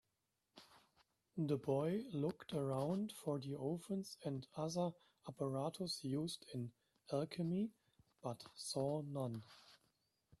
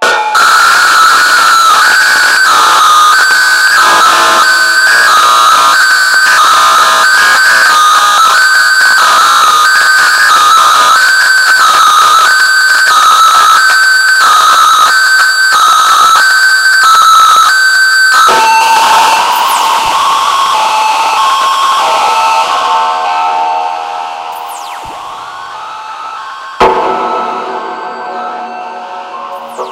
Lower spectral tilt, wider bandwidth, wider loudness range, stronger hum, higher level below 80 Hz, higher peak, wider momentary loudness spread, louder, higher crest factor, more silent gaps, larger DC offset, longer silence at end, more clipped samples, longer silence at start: first, -6.5 dB/octave vs 1.5 dB/octave; second, 13.5 kHz vs 16.5 kHz; second, 3 LU vs 10 LU; neither; second, -80 dBFS vs -50 dBFS; second, -26 dBFS vs 0 dBFS; second, 12 LU vs 16 LU; second, -44 LUFS vs -5 LUFS; first, 18 dB vs 6 dB; neither; second, under 0.1% vs 0.1%; first, 0.65 s vs 0 s; second, under 0.1% vs 0.4%; first, 0.55 s vs 0 s